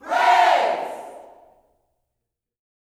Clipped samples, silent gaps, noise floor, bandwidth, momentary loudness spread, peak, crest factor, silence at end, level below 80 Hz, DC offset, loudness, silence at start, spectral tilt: under 0.1%; none; -82 dBFS; 14 kHz; 21 LU; -4 dBFS; 18 dB; 1.6 s; -72 dBFS; under 0.1%; -18 LUFS; 0.05 s; -1 dB/octave